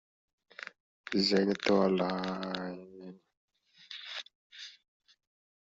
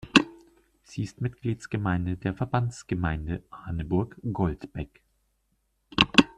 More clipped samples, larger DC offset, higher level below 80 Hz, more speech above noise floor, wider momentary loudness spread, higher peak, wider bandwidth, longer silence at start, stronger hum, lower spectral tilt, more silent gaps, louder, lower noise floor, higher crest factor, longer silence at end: neither; neither; second, -72 dBFS vs -48 dBFS; second, 22 dB vs 44 dB; first, 23 LU vs 15 LU; second, -14 dBFS vs 0 dBFS; second, 7.8 kHz vs 11 kHz; first, 0.6 s vs 0.05 s; neither; second, -4 dB/octave vs -5.5 dB/octave; first, 0.80-1.04 s, 3.37-3.48 s, 4.35-4.50 s vs none; second, -31 LUFS vs -28 LUFS; second, -52 dBFS vs -73 dBFS; second, 22 dB vs 28 dB; first, 0.95 s vs 0.05 s